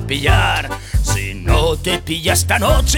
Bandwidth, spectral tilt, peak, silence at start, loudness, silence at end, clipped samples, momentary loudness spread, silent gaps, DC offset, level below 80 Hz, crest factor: 18 kHz; -3.5 dB/octave; -2 dBFS; 0 s; -16 LUFS; 0 s; under 0.1%; 6 LU; none; under 0.1%; -20 dBFS; 14 dB